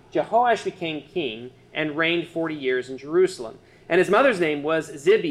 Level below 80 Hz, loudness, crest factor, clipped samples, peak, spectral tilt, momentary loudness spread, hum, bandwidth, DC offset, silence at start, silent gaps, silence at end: -62 dBFS; -23 LUFS; 16 dB; under 0.1%; -6 dBFS; -5 dB/octave; 12 LU; none; 12 kHz; under 0.1%; 0.15 s; none; 0 s